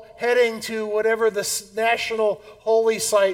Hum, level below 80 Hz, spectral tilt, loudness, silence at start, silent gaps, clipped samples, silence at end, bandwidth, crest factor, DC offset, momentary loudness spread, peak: none; -62 dBFS; -2 dB/octave; -21 LUFS; 0 s; none; under 0.1%; 0 s; 17.5 kHz; 14 dB; under 0.1%; 6 LU; -6 dBFS